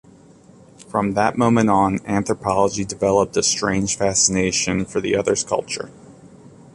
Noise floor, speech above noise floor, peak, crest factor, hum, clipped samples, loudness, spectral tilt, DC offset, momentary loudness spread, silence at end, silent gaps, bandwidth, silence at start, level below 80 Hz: -47 dBFS; 28 dB; -2 dBFS; 18 dB; none; under 0.1%; -19 LUFS; -4 dB/octave; under 0.1%; 7 LU; 0.45 s; none; 11.5 kHz; 0.8 s; -46 dBFS